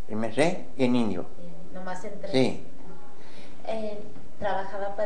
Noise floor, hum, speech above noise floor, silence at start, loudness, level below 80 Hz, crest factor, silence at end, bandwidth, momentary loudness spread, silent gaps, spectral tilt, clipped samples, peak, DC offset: -49 dBFS; none; 21 dB; 0.1 s; -29 LUFS; -60 dBFS; 20 dB; 0 s; 10 kHz; 23 LU; none; -6 dB/octave; under 0.1%; -8 dBFS; 6%